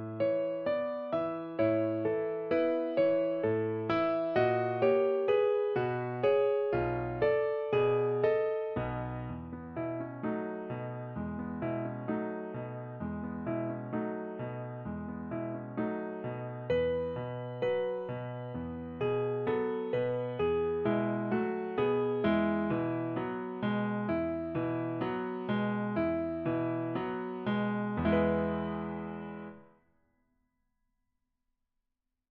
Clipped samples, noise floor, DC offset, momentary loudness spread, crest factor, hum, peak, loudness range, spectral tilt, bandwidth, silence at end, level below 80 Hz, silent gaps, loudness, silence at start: under 0.1%; -86 dBFS; under 0.1%; 11 LU; 16 dB; none; -16 dBFS; 8 LU; -6.5 dB/octave; 5.4 kHz; 2.65 s; -58 dBFS; none; -33 LUFS; 0 s